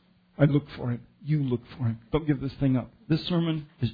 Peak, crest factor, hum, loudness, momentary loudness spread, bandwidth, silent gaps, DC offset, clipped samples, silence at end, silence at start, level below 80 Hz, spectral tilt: -6 dBFS; 20 dB; none; -28 LUFS; 9 LU; 5 kHz; none; under 0.1%; under 0.1%; 0 s; 0.4 s; -50 dBFS; -10 dB/octave